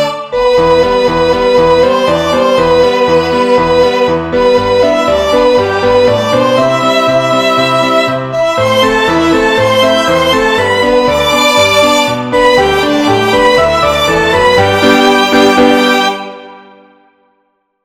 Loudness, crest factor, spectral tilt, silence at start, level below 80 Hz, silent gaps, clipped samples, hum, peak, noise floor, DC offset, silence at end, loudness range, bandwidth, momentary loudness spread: -9 LUFS; 10 dB; -4 dB/octave; 0 s; -34 dBFS; none; 0.6%; none; 0 dBFS; -60 dBFS; under 0.1%; 1.25 s; 2 LU; 16 kHz; 3 LU